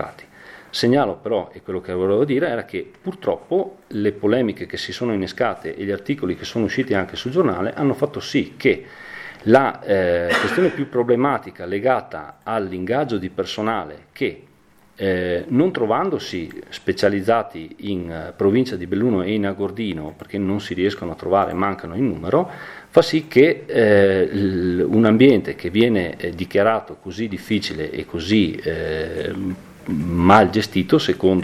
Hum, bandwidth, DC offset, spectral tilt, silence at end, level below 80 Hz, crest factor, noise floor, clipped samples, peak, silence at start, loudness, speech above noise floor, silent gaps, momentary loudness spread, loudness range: none; 14 kHz; under 0.1%; -6.5 dB/octave; 0 s; -50 dBFS; 20 dB; -54 dBFS; under 0.1%; 0 dBFS; 0 s; -20 LUFS; 34 dB; none; 12 LU; 6 LU